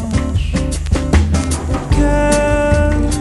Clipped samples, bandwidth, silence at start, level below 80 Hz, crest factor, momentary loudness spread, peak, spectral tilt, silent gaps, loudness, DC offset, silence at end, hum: under 0.1%; 12 kHz; 0 s; -18 dBFS; 14 dB; 5 LU; 0 dBFS; -6 dB/octave; none; -15 LUFS; under 0.1%; 0 s; none